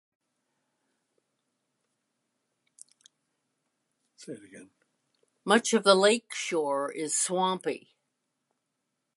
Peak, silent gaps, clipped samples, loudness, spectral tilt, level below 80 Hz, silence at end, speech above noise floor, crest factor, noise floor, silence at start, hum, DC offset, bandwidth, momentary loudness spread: -6 dBFS; none; under 0.1%; -26 LUFS; -2.5 dB/octave; -86 dBFS; 1.4 s; 55 dB; 26 dB; -82 dBFS; 4.2 s; none; under 0.1%; 11.5 kHz; 23 LU